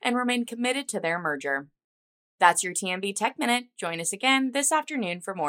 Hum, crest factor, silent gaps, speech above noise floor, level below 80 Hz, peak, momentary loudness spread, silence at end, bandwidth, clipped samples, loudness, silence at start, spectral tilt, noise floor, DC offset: none; 24 dB; 1.84-2.38 s; over 64 dB; -82 dBFS; -4 dBFS; 9 LU; 0 s; 16 kHz; under 0.1%; -26 LUFS; 0.05 s; -2 dB/octave; under -90 dBFS; under 0.1%